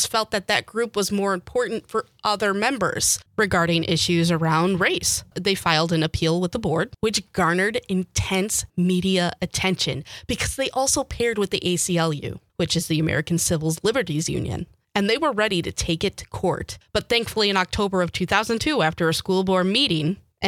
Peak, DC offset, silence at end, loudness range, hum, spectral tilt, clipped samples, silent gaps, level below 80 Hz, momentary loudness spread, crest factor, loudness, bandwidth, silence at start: -2 dBFS; under 0.1%; 0 s; 3 LU; none; -4 dB/octave; under 0.1%; none; -46 dBFS; 6 LU; 20 dB; -22 LUFS; 16.5 kHz; 0 s